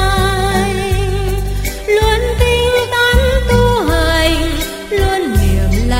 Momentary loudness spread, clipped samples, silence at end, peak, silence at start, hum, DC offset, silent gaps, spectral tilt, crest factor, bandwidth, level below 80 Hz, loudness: 7 LU; under 0.1%; 0 s; 0 dBFS; 0 s; none; under 0.1%; none; -5 dB/octave; 12 dB; 16.5 kHz; -18 dBFS; -14 LUFS